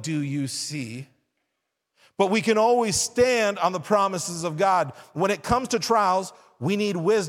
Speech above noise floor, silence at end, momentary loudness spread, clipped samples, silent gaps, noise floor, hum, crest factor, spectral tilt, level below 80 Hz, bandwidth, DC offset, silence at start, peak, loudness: 56 dB; 0 s; 11 LU; under 0.1%; none; -80 dBFS; none; 18 dB; -4 dB/octave; -54 dBFS; 17 kHz; under 0.1%; 0 s; -6 dBFS; -23 LUFS